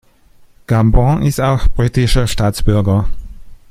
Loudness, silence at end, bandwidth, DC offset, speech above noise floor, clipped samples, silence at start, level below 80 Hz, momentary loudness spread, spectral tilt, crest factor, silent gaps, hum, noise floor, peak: -15 LUFS; 0.15 s; 15.5 kHz; under 0.1%; 34 dB; under 0.1%; 0.7 s; -20 dBFS; 5 LU; -6.5 dB/octave; 12 dB; none; none; -45 dBFS; 0 dBFS